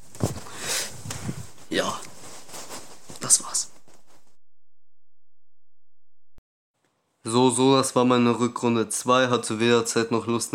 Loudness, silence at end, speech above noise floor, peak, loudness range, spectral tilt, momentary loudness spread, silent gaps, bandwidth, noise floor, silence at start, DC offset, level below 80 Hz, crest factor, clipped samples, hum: -23 LUFS; 0 s; over 68 dB; -2 dBFS; 10 LU; -3.5 dB/octave; 20 LU; 6.38-6.74 s; 17 kHz; under -90 dBFS; 0 s; under 0.1%; -60 dBFS; 22 dB; under 0.1%; none